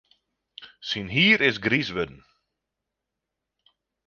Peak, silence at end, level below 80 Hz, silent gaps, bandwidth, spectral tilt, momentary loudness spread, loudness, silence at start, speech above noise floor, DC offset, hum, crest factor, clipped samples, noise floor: -6 dBFS; 1.95 s; -58 dBFS; none; 7.2 kHz; -5 dB/octave; 15 LU; -22 LUFS; 0.6 s; 61 dB; under 0.1%; none; 22 dB; under 0.1%; -84 dBFS